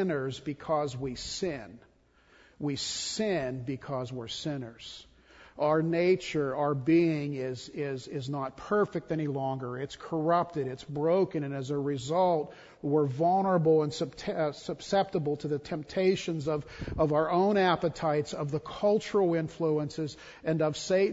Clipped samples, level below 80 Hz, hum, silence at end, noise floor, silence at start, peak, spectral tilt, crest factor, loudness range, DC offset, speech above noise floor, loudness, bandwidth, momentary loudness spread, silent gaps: under 0.1%; -58 dBFS; none; 0 s; -62 dBFS; 0 s; -12 dBFS; -6 dB/octave; 18 dB; 6 LU; under 0.1%; 33 dB; -30 LUFS; 8 kHz; 11 LU; none